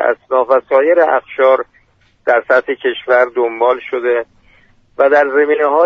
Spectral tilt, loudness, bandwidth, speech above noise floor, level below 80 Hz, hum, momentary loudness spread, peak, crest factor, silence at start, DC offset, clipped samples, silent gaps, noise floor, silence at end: -5 dB/octave; -13 LUFS; 6 kHz; 40 dB; -58 dBFS; none; 7 LU; 0 dBFS; 14 dB; 0 s; under 0.1%; under 0.1%; none; -53 dBFS; 0 s